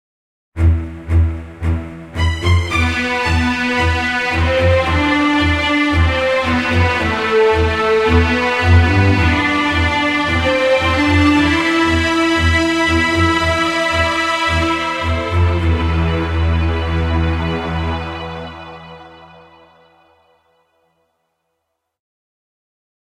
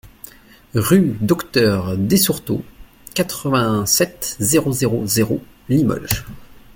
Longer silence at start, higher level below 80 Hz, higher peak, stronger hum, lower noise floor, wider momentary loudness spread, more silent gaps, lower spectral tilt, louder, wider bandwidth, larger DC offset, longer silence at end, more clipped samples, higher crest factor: first, 0.55 s vs 0.05 s; first, -26 dBFS vs -44 dBFS; about the same, 0 dBFS vs 0 dBFS; neither; first, -73 dBFS vs -42 dBFS; about the same, 8 LU vs 10 LU; neither; first, -6 dB/octave vs -4.5 dB/octave; first, -15 LUFS vs -18 LUFS; second, 11 kHz vs 17 kHz; neither; first, 3.8 s vs 0.15 s; neither; about the same, 16 dB vs 18 dB